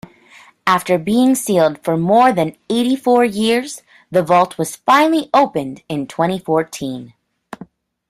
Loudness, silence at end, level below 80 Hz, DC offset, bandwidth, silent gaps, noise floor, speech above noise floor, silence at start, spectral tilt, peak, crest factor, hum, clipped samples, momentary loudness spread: -16 LUFS; 0.45 s; -58 dBFS; under 0.1%; 15.5 kHz; none; -46 dBFS; 31 dB; 0.65 s; -5 dB/octave; -2 dBFS; 16 dB; none; under 0.1%; 14 LU